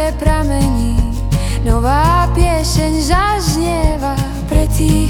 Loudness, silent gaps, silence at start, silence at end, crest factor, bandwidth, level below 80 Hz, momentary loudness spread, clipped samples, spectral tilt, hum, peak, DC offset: -15 LUFS; none; 0 s; 0 s; 12 dB; 17.5 kHz; -16 dBFS; 5 LU; under 0.1%; -5.5 dB/octave; none; 0 dBFS; under 0.1%